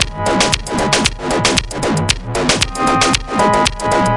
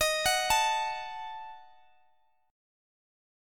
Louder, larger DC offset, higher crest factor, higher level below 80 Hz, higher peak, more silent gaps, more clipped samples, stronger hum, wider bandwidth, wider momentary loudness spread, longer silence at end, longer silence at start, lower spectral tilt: first, -14 LUFS vs -28 LUFS; neither; about the same, 16 dB vs 20 dB; first, -30 dBFS vs -58 dBFS; first, 0 dBFS vs -12 dBFS; neither; neither; neither; second, 11.5 kHz vs 17.5 kHz; second, 3 LU vs 18 LU; second, 0 s vs 1.85 s; about the same, 0 s vs 0 s; first, -3 dB/octave vs 0.5 dB/octave